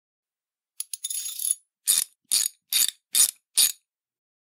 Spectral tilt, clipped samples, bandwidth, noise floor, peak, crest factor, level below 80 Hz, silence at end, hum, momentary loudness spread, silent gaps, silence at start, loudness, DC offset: 4.5 dB/octave; under 0.1%; 16.5 kHz; under -90 dBFS; -6 dBFS; 22 dB; -88 dBFS; 0.7 s; none; 12 LU; none; 0.8 s; -23 LUFS; under 0.1%